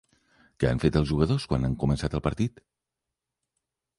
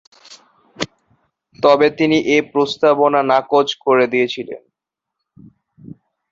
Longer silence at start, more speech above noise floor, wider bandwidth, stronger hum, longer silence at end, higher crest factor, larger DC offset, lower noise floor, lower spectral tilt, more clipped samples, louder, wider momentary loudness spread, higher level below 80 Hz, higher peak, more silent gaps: first, 0.6 s vs 0.3 s; second, 61 dB vs 68 dB; first, 11.5 kHz vs 7.6 kHz; neither; second, 1.5 s vs 1.75 s; about the same, 20 dB vs 18 dB; neither; first, -87 dBFS vs -82 dBFS; first, -7.5 dB/octave vs -5 dB/octave; neither; second, -27 LUFS vs -16 LUFS; second, 5 LU vs 14 LU; first, -40 dBFS vs -60 dBFS; second, -8 dBFS vs 0 dBFS; neither